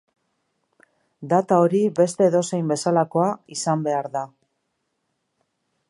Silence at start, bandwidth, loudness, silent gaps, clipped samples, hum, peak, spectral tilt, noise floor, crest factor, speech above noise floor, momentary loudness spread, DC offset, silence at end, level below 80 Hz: 1.2 s; 11.5 kHz; -21 LUFS; none; under 0.1%; none; -4 dBFS; -6 dB/octave; -75 dBFS; 18 dB; 54 dB; 11 LU; under 0.1%; 1.65 s; -74 dBFS